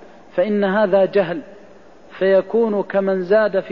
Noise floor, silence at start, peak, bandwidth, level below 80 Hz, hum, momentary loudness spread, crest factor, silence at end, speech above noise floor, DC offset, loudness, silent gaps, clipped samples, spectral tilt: -45 dBFS; 0.35 s; -4 dBFS; 5.6 kHz; -60 dBFS; none; 7 LU; 14 dB; 0 s; 28 dB; 0.4%; -18 LUFS; none; under 0.1%; -8.5 dB/octave